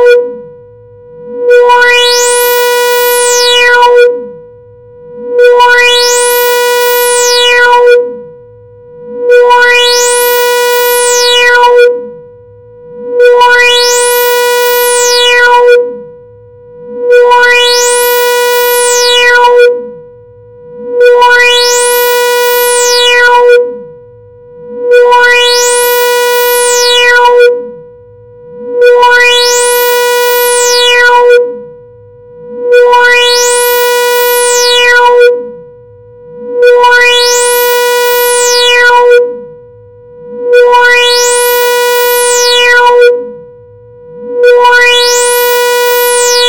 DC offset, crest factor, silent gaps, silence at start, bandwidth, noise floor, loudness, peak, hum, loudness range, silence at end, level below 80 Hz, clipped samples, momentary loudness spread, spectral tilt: 1%; 6 dB; none; 0 s; 17.5 kHz; -33 dBFS; -5 LUFS; 0 dBFS; none; 2 LU; 0 s; -46 dBFS; 0.9%; 13 LU; 1.5 dB/octave